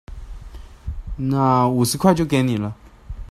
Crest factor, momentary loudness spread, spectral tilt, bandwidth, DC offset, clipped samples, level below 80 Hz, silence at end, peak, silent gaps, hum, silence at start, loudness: 18 dB; 23 LU; -6 dB/octave; 15 kHz; under 0.1%; under 0.1%; -36 dBFS; 0.05 s; -2 dBFS; none; none; 0.1 s; -19 LUFS